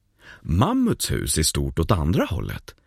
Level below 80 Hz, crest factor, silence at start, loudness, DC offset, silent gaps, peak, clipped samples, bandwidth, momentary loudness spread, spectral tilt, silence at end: -34 dBFS; 18 dB; 0.25 s; -22 LUFS; under 0.1%; none; -6 dBFS; under 0.1%; 15.5 kHz; 9 LU; -5 dB/octave; 0.15 s